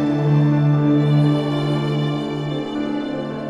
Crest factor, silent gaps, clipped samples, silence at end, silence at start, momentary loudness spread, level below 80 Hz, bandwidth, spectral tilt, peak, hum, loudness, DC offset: 12 dB; none; under 0.1%; 0 s; 0 s; 8 LU; -54 dBFS; 7.4 kHz; -8.5 dB/octave; -6 dBFS; none; -19 LUFS; under 0.1%